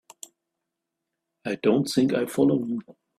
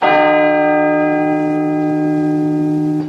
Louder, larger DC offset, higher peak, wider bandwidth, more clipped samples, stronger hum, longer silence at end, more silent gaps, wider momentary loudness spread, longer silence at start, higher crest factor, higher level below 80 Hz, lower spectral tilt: second, -24 LUFS vs -14 LUFS; neither; second, -8 dBFS vs 0 dBFS; first, 14 kHz vs 6 kHz; neither; neither; first, 0.4 s vs 0 s; neither; first, 22 LU vs 5 LU; first, 1.45 s vs 0 s; about the same, 18 dB vs 14 dB; second, -66 dBFS vs -58 dBFS; second, -6 dB/octave vs -8 dB/octave